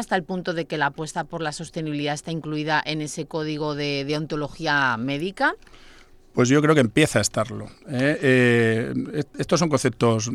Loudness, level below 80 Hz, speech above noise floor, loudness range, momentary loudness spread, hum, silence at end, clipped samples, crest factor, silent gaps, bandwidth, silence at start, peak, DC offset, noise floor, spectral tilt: -23 LUFS; -52 dBFS; 26 dB; 6 LU; 11 LU; none; 0 s; under 0.1%; 18 dB; none; 14.5 kHz; 0 s; -4 dBFS; under 0.1%; -48 dBFS; -5 dB/octave